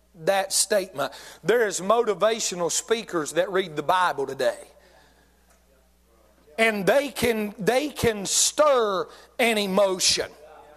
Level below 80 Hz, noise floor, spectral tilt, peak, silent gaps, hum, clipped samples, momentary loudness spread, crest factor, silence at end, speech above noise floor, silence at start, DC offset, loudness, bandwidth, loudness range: -56 dBFS; -60 dBFS; -2.5 dB/octave; -8 dBFS; none; none; under 0.1%; 8 LU; 18 dB; 0.2 s; 37 dB; 0.15 s; under 0.1%; -23 LUFS; 15 kHz; 5 LU